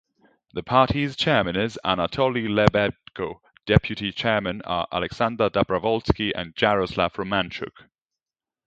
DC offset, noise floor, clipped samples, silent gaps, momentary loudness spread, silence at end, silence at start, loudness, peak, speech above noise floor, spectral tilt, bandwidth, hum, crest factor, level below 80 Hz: under 0.1%; under -90 dBFS; under 0.1%; none; 12 LU; 1 s; 0.55 s; -23 LUFS; 0 dBFS; over 67 dB; -6.5 dB/octave; 8.8 kHz; none; 24 dB; -42 dBFS